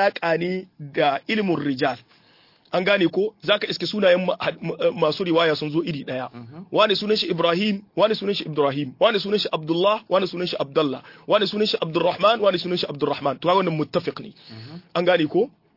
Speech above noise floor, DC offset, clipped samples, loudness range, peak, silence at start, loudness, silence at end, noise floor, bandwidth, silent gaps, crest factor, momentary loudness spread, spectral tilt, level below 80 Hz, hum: 34 dB; under 0.1%; under 0.1%; 2 LU; -4 dBFS; 0 s; -22 LUFS; 0.3 s; -56 dBFS; 5.8 kHz; none; 18 dB; 10 LU; -6.5 dB/octave; -68 dBFS; none